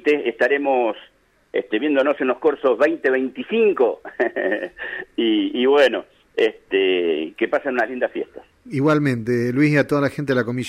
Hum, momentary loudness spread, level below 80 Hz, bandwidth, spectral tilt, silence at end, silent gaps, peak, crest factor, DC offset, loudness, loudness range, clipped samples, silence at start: none; 10 LU; -62 dBFS; 12 kHz; -6.5 dB/octave; 0 s; none; -4 dBFS; 16 dB; under 0.1%; -20 LUFS; 1 LU; under 0.1%; 0.05 s